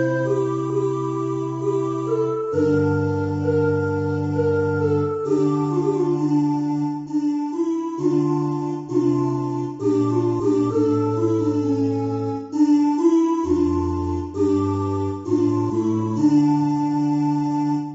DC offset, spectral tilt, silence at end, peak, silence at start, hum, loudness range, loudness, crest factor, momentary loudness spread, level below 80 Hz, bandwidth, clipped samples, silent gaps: under 0.1%; -9 dB/octave; 0 s; -6 dBFS; 0 s; none; 2 LU; -21 LUFS; 14 dB; 6 LU; -50 dBFS; 8 kHz; under 0.1%; none